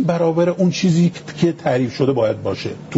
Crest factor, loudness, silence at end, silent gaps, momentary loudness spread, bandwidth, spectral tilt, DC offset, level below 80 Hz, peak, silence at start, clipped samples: 16 dB; -18 LUFS; 0 s; none; 6 LU; 8 kHz; -6.5 dB/octave; under 0.1%; -54 dBFS; -2 dBFS; 0 s; under 0.1%